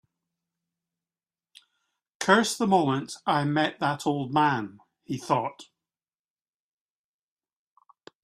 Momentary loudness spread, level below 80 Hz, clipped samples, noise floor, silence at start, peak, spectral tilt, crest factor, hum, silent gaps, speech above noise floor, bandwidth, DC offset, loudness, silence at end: 13 LU; -72 dBFS; under 0.1%; under -90 dBFS; 2.2 s; -6 dBFS; -5 dB/octave; 24 dB; none; none; over 65 dB; 15 kHz; under 0.1%; -26 LUFS; 2.6 s